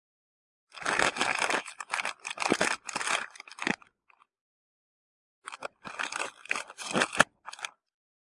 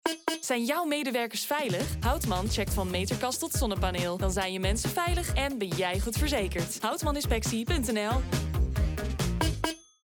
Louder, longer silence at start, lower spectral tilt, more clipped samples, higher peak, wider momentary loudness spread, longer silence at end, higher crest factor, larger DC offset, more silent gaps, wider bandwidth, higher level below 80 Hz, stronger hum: about the same, -30 LUFS vs -29 LUFS; first, 0.75 s vs 0.05 s; second, -1.5 dB/octave vs -4.5 dB/octave; neither; first, -2 dBFS vs -12 dBFS; first, 15 LU vs 2 LU; first, 0.65 s vs 0.25 s; first, 30 dB vs 18 dB; neither; first, 4.41-5.42 s vs none; second, 11.5 kHz vs over 20 kHz; second, -70 dBFS vs -36 dBFS; neither